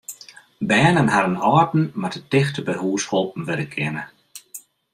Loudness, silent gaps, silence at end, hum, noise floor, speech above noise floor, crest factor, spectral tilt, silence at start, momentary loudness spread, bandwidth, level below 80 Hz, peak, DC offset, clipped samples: -20 LUFS; none; 0.35 s; none; -45 dBFS; 25 dB; 20 dB; -5.5 dB/octave; 0.1 s; 21 LU; 15.5 kHz; -56 dBFS; -2 dBFS; under 0.1%; under 0.1%